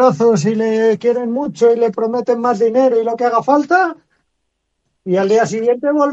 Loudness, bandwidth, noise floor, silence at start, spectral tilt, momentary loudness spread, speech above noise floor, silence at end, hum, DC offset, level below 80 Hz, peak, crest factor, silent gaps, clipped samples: -15 LUFS; 8 kHz; -71 dBFS; 0 s; -6 dB/octave; 5 LU; 57 dB; 0 s; none; under 0.1%; -64 dBFS; 0 dBFS; 14 dB; none; under 0.1%